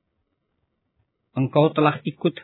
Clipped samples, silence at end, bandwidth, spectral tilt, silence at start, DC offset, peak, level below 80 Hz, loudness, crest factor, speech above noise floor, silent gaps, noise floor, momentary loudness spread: under 0.1%; 0 s; 4.2 kHz; -11 dB/octave; 1.35 s; under 0.1%; -4 dBFS; -72 dBFS; -21 LUFS; 20 dB; 54 dB; none; -74 dBFS; 9 LU